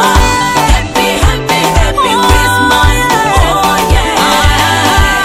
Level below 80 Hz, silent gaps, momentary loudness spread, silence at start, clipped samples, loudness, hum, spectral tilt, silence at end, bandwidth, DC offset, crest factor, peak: -14 dBFS; none; 2 LU; 0 s; 1%; -9 LUFS; none; -3.5 dB/octave; 0 s; 16.5 kHz; under 0.1%; 8 dB; 0 dBFS